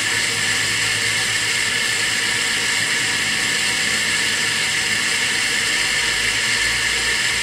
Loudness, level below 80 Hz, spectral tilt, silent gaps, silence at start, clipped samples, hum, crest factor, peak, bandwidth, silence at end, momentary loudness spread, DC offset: -17 LUFS; -46 dBFS; 0 dB/octave; none; 0 s; under 0.1%; none; 14 dB; -4 dBFS; 16 kHz; 0 s; 1 LU; under 0.1%